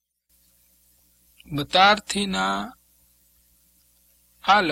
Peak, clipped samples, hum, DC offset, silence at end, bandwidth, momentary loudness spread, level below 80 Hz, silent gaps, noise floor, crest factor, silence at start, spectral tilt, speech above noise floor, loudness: -2 dBFS; under 0.1%; 60 Hz at -55 dBFS; under 0.1%; 0 s; 16.5 kHz; 15 LU; -56 dBFS; none; -65 dBFS; 22 dB; 1.5 s; -3.5 dB/octave; 44 dB; -21 LUFS